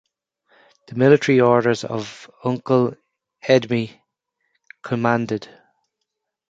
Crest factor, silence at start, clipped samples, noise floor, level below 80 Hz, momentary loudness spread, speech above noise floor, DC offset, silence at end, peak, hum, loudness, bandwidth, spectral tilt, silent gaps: 20 dB; 0.9 s; under 0.1%; -79 dBFS; -64 dBFS; 17 LU; 61 dB; under 0.1%; 1.05 s; -2 dBFS; none; -19 LUFS; 7.8 kHz; -6.5 dB/octave; none